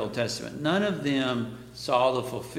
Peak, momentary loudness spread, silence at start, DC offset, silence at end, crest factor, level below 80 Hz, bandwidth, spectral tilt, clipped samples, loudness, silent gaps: -10 dBFS; 8 LU; 0 s; under 0.1%; 0 s; 18 dB; -60 dBFS; 16.5 kHz; -5 dB/octave; under 0.1%; -27 LUFS; none